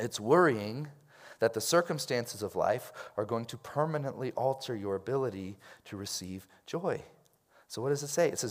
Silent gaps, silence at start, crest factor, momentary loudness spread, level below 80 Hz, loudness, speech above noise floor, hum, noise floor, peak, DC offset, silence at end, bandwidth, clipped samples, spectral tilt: none; 0 s; 22 dB; 15 LU; -78 dBFS; -32 LUFS; 33 dB; none; -65 dBFS; -12 dBFS; under 0.1%; 0 s; 16 kHz; under 0.1%; -4.5 dB/octave